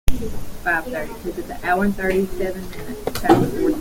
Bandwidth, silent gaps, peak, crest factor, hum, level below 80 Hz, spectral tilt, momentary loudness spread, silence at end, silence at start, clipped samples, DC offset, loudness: 17 kHz; none; 0 dBFS; 20 dB; none; -30 dBFS; -6 dB/octave; 13 LU; 0 s; 0.05 s; under 0.1%; under 0.1%; -22 LUFS